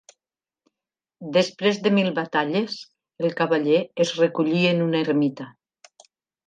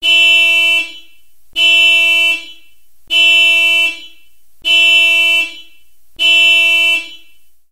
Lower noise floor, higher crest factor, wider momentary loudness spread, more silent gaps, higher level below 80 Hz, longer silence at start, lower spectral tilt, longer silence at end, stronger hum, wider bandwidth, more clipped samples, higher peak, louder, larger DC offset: first, under -90 dBFS vs -52 dBFS; about the same, 16 dB vs 12 dB; about the same, 10 LU vs 11 LU; neither; second, -74 dBFS vs -60 dBFS; first, 1.2 s vs 0 s; first, -6 dB/octave vs 2.5 dB/octave; first, 0.95 s vs 0.55 s; neither; second, 9.4 kHz vs 16 kHz; neither; second, -6 dBFS vs 0 dBFS; second, -22 LUFS vs -8 LUFS; second, under 0.1% vs 2%